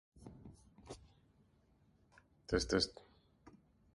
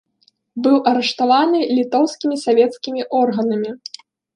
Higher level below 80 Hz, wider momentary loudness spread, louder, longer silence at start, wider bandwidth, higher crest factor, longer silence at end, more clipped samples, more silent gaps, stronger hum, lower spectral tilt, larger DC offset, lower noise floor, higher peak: first, -58 dBFS vs -72 dBFS; first, 25 LU vs 11 LU; second, -37 LUFS vs -17 LUFS; second, 0.2 s vs 0.55 s; about the same, 11.5 kHz vs 10.5 kHz; first, 26 dB vs 16 dB; first, 1.05 s vs 0.6 s; neither; neither; neither; about the same, -4 dB/octave vs -5 dB/octave; neither; first, -72 dBFS vs -61 dBFS; second, -20 dBFS vs -2 dBFS